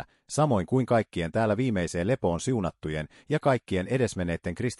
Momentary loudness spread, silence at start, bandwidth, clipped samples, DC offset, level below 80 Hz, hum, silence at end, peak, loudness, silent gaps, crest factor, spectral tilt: 7 LU; 0 s; 12 kHz; under 0.1%; under 0.1%; -54 dBFS; none; 0.05 s; -10 dBFS; -27 LUFS; none; 16 dB; -6.5 dB/octave